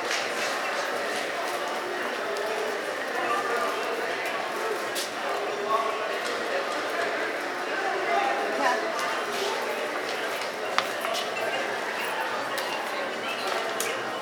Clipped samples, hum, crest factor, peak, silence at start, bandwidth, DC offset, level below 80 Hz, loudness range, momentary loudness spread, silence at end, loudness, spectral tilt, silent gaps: under 0.1%; none; 24 dB; -4 dBFS; 0 s; over 20 kHz; under 0.1%; -84 dBFS; 1 LU; 4 LU; 0 s; -28 LUFS; -1.5 dB/octave; none